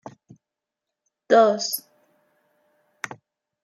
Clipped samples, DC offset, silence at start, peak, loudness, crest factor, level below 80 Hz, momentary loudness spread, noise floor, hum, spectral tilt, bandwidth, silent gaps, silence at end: under 0.1%; under 0.1%; 0.05 s; -4 dBFS; -20 LUFS; 22 dB; -80 dBFS; 19 LU; -86 dBFS; none; -3 dB/octave; 15.5 kHz; none; 0.5 s